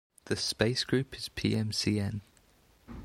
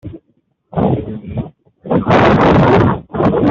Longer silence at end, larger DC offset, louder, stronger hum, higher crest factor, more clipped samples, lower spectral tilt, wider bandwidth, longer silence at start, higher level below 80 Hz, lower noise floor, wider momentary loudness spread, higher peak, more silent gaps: about the same, 0 s vs 0 s; neither; second, -31 LUFS vs -12 LUFS; neither; first, 22 dB vs 12 dB; neither; second, -4.5 dB/octave vs -8.5 dB/octave; first, 15.5 kHz vs 7.4 kHz; first, 0.25 s vs 0.05 s; second, -56 dBFS vs -34 dBFS; about the same, -64 dBFS vs -61 dBFS; second, 9 LU vs 16 LU; second, -12 dBFS vs -2 dBFS; neither